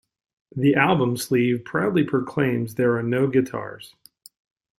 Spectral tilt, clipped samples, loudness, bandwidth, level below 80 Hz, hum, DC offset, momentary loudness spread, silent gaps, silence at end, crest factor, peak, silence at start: -6.5 dB/octave; under 0.1%; -22 LUFS; 16 kHz; -60 dBFS; none; under 0.1%; 12 LU; none; 0.95 s; 20 dB; -2 dBFS; 0.55 s